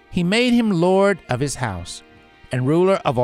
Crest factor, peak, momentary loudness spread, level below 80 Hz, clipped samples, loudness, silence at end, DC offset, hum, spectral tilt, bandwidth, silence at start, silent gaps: 14 dB; -4 dBFS; 13 LU; -46 dBFS; under 0.1%; -19 LUFS; 0 s; under 0.1%; none; -6 dB/octave; 13.5 kHz; 0.1 s; none